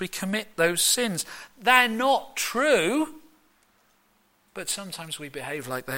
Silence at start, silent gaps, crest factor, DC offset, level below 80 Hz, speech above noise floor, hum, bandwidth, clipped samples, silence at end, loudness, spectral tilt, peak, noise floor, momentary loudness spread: 0 s; none; 22 dB; under 0.1%; -64 dBFS; 40 dB; none; 16.5 kHz; under 0.1%; 0 s; -24 LUFS; -2 dB/octave; -6 dBFS; -65 dBFS; 15 LU